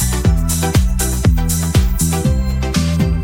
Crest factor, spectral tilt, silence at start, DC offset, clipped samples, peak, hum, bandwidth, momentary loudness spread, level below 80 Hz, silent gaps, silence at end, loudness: 14 dB; -5 dB/octave; 0 s; under 0.1%; under 0.1%; 0 dBFS; none; 17 kHz; 2 LU; -18 dBFS; none; 0 s; -16 LUFS